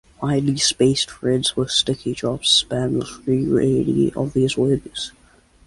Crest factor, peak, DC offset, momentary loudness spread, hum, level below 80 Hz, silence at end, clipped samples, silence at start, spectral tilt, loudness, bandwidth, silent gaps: 16 dB; -4 dBFS; under 0.1%; 8 LU; none; -48 dBFS; 0.55 s; under 0.1%; 0.2 s; -4.5 dB/octave; -19 LUFS; 11.5 kHz; none